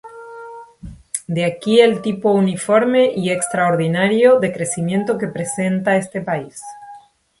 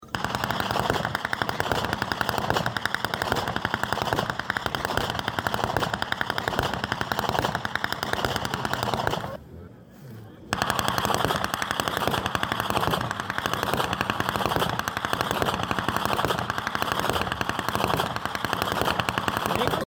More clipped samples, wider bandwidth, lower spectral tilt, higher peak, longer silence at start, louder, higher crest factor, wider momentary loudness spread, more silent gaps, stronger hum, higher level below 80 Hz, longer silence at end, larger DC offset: neither; second, 11.5 kHz vs over 20 kHz; about the same, -5 dB/octave vs -4 dB/octave; first, 0 dBFS vs -6 dBFS; about the same, 0.05 s vs 0 s; first, -17 LUFS vs -26 LUFS; about the same, 18 dB vs 20 dB; first, 21 LU vs 3 LU; neither; neither; second, -54 dBFS vs -48 dBFS; first, 0.4 s vs 0 s; neither